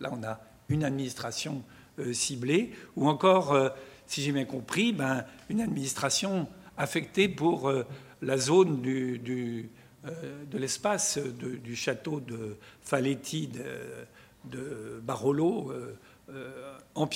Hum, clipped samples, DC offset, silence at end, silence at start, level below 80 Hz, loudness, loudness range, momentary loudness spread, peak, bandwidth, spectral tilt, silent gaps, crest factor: none; under 0.1%; under 0.1%; 0 s; 0 s; -66 dBFS; -30 LUFS; 7 LU; 18 LU; -8 dBFS; 16 kHz; -4.5 dB/octave; none; 22 dB